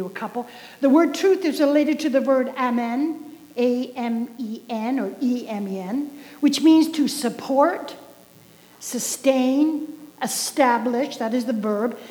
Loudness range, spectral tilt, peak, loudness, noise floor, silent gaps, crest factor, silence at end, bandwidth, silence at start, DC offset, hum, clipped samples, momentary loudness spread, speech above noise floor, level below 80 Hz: 4 LU; -4 dB/octave; -4 dBFS; -22 LUFS; -50 dBFS; none; 18 dB; 0 s; over 20 kHz; 0 s; under 0.1%; 60 Hz at -60 dBFS; under 0.1%; 13 LU; 29 dB; -76 dBFS